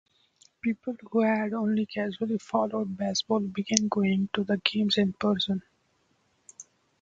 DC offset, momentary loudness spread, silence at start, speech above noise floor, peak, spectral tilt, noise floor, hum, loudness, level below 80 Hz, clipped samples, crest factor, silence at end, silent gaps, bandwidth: under 0.1%; 7 LU; 0.65 s; 43 dB; 0 dBFS; -4.5 dB/octave; -70 dBFS; none; -28 LUFS; -66 dBFS; under 0.1%; 28 dB; 0.4 s; none; 7.8 kHz